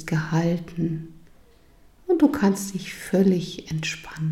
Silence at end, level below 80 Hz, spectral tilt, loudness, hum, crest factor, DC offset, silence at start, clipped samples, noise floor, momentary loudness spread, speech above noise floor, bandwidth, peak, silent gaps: 0 s; -52 dBFS; -6 dB/octave; -24 LUFS; none; 18 dB; under 0.1%; 0 s; under 0.1%; -53 dBFS; 12 LU; 30 dB; 14.5 kHz; -6 dBFS; none